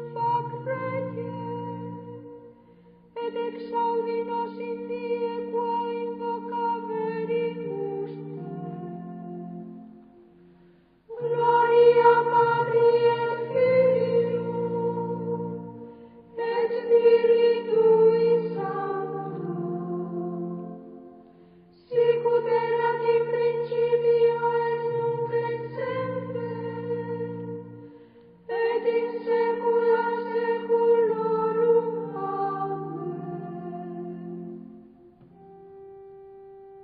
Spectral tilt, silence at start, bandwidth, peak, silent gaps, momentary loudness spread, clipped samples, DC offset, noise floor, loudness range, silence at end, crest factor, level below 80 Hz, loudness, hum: -10.5 dB/octave; 0 s; 4.9 kHz; -6 dBFS; none; 18 LU; under 0.1%; under 0.1%; -57 dBFS; 12 LU; 0 s; 20 dB; -70 dBFS; -25 LUFS; none